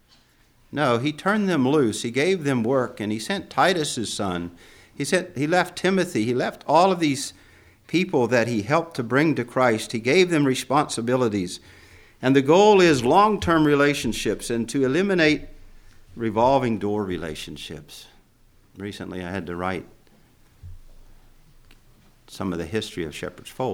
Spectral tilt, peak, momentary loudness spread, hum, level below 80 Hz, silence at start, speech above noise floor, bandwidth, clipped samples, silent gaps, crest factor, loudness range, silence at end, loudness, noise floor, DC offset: -5 dB/octave; -4 dBFS; 15 LU; none; -50 dBFS; 0.7 s; 36 dB; 17 kHz; under 0.1%; none; 18 dB; 15 LU; 0 s; -22 LUFS; -58 dBFS; under 0.1%